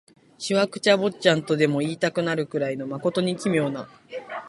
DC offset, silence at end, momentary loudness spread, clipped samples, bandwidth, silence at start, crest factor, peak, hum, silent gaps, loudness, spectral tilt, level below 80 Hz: under 0.1%; 0 s; 14 LU; under 0.1%; 11.5 kHz; 0.4 s; 22 dB; -2 dBFS; none; none; -23 LUFS; -5 dB/octave; -66 dBFS